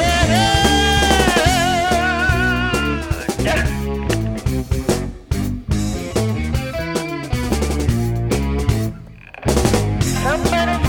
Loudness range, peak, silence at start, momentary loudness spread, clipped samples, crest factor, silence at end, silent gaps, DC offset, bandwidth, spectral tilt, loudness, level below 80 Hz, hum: 6 LU; -2 dBFS; 0 s; 9 LU; under 0.1%; 16 dB; 0 s; none; under 0.1%; 19 kHz; -4.5 dB/octave; -18 LUFS; -26 dBFS; none